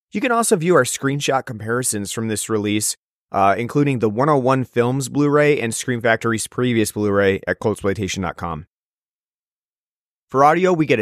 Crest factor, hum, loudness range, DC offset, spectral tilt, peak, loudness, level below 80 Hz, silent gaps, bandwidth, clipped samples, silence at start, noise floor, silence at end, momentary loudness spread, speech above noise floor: 18 dB; none; 4 LU; under 0.1%; -5 dB/octave; -2 dBFS; -19 LUFS; -54 dBFS; 2.97-3.27 s, 8.67-10.28 s; 15.5 kHz; under 0.1%; 0.15 s; under -90 dBFS; 0 s; 8 LU; over 72 dB